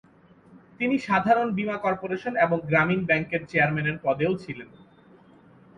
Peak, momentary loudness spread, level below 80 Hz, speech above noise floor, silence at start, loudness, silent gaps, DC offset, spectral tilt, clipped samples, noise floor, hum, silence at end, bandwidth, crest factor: -8 dBFS; 8 LU; -60 dBFS; 30 dB; 0.5 s; -24 LUFS; none; under 0.1%; -7.5 dB/octave; under 0.1%; -54 dBFS; none; 1.1 s; 9.4 kHz; 18 dB